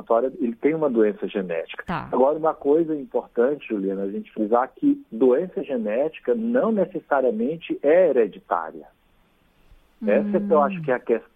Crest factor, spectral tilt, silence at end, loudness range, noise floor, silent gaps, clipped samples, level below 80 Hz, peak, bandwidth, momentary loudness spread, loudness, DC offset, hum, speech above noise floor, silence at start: 18 dB; -9.5 dB/octave; 0.15 s; 2 LU; -61 dBFS; none; under 0.1%; -60 dBFS; -6 dBFS; 4.5 kHz; 8 LU; -23 LUFS; under 0.1%; none; 39 dB; 0 s